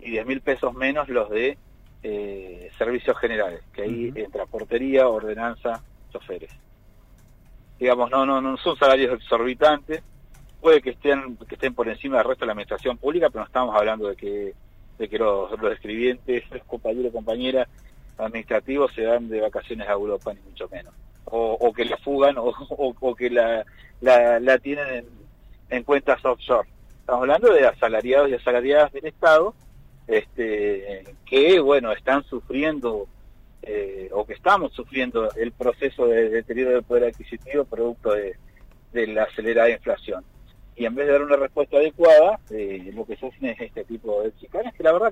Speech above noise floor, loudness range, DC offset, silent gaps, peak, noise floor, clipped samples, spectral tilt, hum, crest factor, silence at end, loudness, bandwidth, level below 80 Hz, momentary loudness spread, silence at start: 29 dB; 6 LU; under 0.1%; none; -6 dBFS; -51 dBFS; under 0.1%; -5.5 dB/octave; none; 16 dB; 0 s; -22 LUFS; 9.2 kHz; -48 dBFS; 15 LU; 0 s